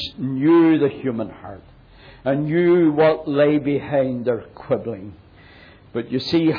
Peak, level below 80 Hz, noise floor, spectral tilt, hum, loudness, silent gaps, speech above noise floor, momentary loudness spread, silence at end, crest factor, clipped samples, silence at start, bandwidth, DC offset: -6 dBFS; -54 dBFS; -46 dBFS; -8.5 dB/octave; none; -19 LUFS; none; 27 dB; 16 LU; 0 s; 14 dB; under 0.1%; 0 s; 5.2 kHz; under 0.1%